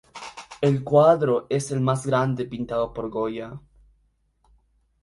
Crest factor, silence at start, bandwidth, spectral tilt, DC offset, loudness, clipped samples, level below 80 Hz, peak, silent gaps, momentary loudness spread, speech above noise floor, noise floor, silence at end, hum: 20 dB; 0.15 s; 11.5 kHz; -7 dB/octave; under 0.1%; -23 LUFS; under 0.1%; -54 dBFS; -6 dBFS; none; 21 LU; 44 dB; -66 dBFS; 1.45 s; none